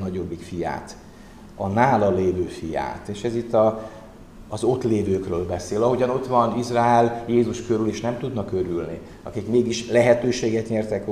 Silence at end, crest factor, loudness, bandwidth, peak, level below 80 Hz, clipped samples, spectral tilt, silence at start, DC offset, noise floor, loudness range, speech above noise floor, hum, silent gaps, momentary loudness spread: 0 s; 18 dB; -22 LUFS; 13 kHz; -4 dBFS; -48 dBFS; under 0.1%; -6.5 dB/octave; 0 s; 0.1%; -43 dBFS; 3 LU; 21 dB; none; none; 13 LU